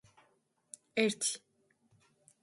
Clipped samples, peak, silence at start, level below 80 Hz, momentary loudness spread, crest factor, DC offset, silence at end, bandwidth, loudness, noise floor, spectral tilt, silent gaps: under 0.1%; -14 dBFS; 0.95 s; -82 dBFS; 22 LU; 26 dB; under 0.1%; 1.05 s; 11.5 kHz; -34 LUFS; -74 dBFS; -2.5 dB/octave; none